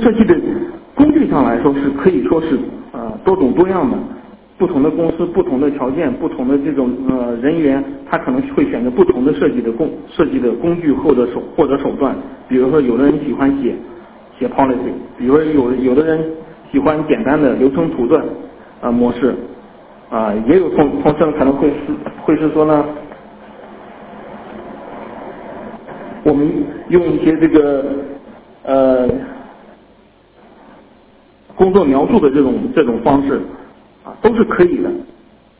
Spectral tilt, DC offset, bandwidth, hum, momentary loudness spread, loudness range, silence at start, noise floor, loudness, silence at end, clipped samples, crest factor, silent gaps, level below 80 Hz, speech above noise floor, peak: -11.5 dB/octave; under 0.1%; 4 kHz; none; 18 LU; 5 LU; 0 s; -47 dBFS; -14 LUFS; 0.55 s; under 0.1%; 14 dB; none; -42 dBFS; 34 dB; 0 dBFS